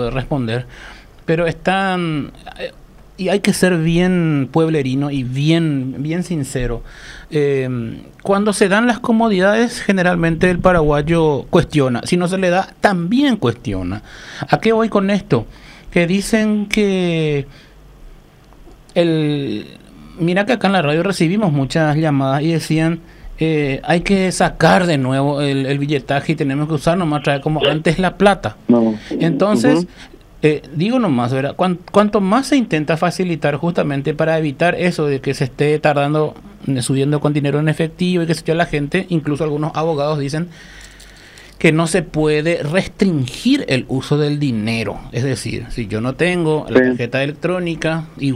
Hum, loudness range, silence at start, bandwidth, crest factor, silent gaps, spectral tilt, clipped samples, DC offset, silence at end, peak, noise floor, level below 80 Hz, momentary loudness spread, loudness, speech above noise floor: none; 4 LU; 0 s; 15 kHz; 16 dB; none; -6 dB/octave; under 0.1%; under 0.1%; 0 s; 0 dBFS; -43 dBFS; -38 dBFS; 9 LU; -17 LUFS; 27 dB